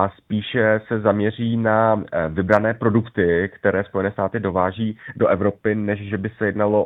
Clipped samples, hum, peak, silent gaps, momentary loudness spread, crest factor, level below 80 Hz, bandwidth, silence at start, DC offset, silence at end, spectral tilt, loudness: under 0.1%; none; 0 dBFS; none; 6 LU; 20 dB; -50 dBFS; 5.4 kHz; 0 s; under 0.1%; 0 s; -9 dB/octave; -20 LUFS